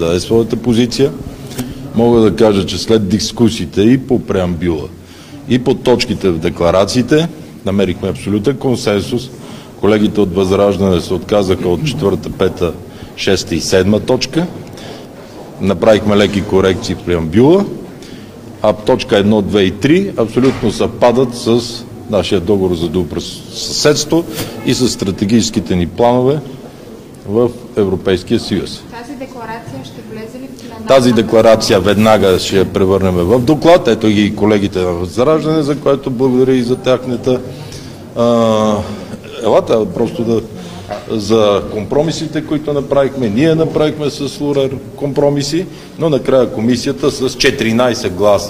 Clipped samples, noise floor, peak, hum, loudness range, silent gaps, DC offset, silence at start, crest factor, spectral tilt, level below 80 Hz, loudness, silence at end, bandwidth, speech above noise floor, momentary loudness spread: 0.1%; -32 dBFS; 0 dBFS; none; 4 LU; none; under 0.1%; 0 s; 14 dB; -5.5 dB/octave; -40 dBFS; -13 LUFS; 0 s; 16 kHz; 20 dB; 17 LU